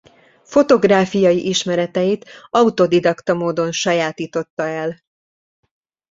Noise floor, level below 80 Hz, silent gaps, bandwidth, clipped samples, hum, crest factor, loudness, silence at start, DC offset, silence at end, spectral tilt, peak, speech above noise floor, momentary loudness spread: -44 dBFS; -58 dBFS; 4.50-4.57 s; 7.8 kHz; under 0.1%; none; 16 dB; -17 LUFS; 0.5 s; under 0.1%; 1.15 s; -5 dB/octave; -2 dBFS; 27 dB; 10 LU